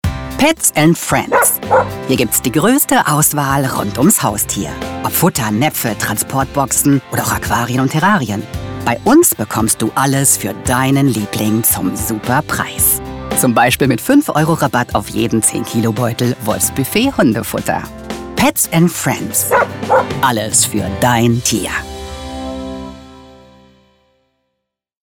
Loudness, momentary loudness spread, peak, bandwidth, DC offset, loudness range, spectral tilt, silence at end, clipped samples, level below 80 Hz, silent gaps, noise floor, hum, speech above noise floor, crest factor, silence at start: -14 LUFS; 9 LU; 0 dBFS; 19 kHz; under 0.1%; 3 LU; -4 dB/octave; 1.7 s; under 0.1%; -36 dBFS; none; -74 dBFS; none; 60 dB; 14 dB; 0.05 s